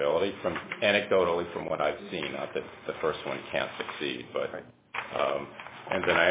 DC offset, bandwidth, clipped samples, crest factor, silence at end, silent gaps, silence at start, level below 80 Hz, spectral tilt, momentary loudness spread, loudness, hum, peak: under 0.1%; 4 kHz; under 0.1%; 20 dB; 0 s; none; 0 s; -60 dBFS; -8 dB/octave; 12 LU; -30 LUFS; none; -10 dBFS